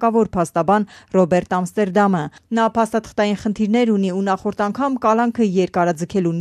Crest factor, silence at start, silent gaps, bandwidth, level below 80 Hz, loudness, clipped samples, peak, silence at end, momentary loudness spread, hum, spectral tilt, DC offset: 14 dB; 0 s; none; 13 kHz; -52 dBFS; -19 LUFS; under 0.1%; -4 dBFS; 0 s; 4 LU; none; -6.5 dB/octave; under 0.1%